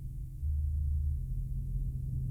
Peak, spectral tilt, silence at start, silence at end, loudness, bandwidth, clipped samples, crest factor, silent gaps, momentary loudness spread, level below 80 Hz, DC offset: -24 dBFS; -10 dB/octave; 0 s; 0 s; -36 LUFS; 0.6 kHz; under 0.1%; 8 dB; none; 5 LU; -34 dBFS; under 0.1%